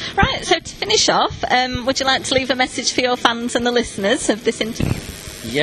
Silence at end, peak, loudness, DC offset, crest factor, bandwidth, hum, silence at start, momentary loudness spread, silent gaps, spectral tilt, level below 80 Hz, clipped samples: 0 s; 0 dBFS; -18 LUFS; under 0.1%; 18 dB; 13 kHz; none; 0 s; 7 LU; none; -3 dB/octave; -38 dBFS; under 0.1%